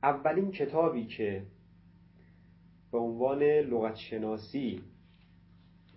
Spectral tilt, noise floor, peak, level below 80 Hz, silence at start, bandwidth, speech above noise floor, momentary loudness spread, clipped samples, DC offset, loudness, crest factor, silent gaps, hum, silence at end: -10 dB/octave; -60 dBFS; -12 dBFS; -64 dBFS; 0.05 s; 5.8 kHz; 29 dB; 11 LU; under 0.1%; under 0.1%; -31 LUFS; 20 dB; none; none; 1.05 s